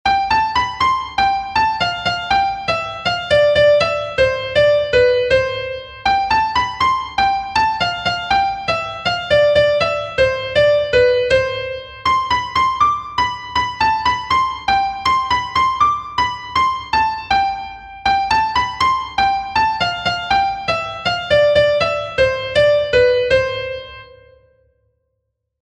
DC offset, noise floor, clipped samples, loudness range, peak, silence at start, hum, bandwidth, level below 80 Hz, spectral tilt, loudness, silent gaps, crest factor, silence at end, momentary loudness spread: under 0.1%; -73 dBFS; under 0.1%; 2 LU; -2 dBFS; 0.05 s; none; 9.8 kHz; -40 dBFS; -3.5 dB/octave; -16 LUFS; none; 16 dB; 1.55 s; 7 LU